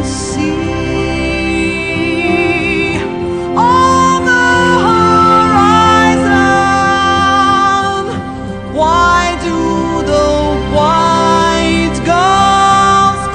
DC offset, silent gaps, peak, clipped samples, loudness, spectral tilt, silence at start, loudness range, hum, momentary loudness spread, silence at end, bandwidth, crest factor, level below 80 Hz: under 0.1%; none; 0 dBFS; under 0.1%; -10 LUFS; -4.5 dB/octave; 0 s; 4 LU; none; 8 LU; 0 s; 10 kHz; 10 dB; -28 dBFS